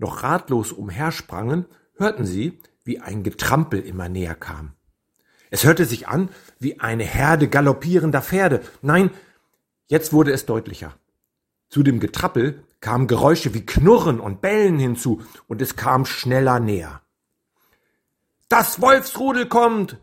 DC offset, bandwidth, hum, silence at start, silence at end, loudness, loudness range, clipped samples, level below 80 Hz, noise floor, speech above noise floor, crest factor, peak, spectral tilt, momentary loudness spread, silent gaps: under 0.1%; 16.5 kHz; none; 0 s; 0.05 s; -19 LUFS; 6 LU; under 0.1%; -42 dBFS; -77 dBFS; 58 dB; 20 dB; 0 dBFS; -6 dB/octave; 13 LU; none